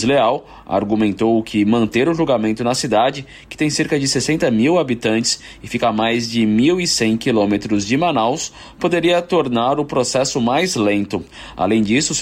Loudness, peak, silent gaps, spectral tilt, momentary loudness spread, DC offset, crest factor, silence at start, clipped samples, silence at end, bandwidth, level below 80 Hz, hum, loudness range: -17 LUFS; -6 dBFS; none; -4.5 dB/octave; 7 LU; under 0.1%; 12 dB; 0 s; under 0.1%; 0 s; 15 kHz; -48 dBFS; none; 1 LU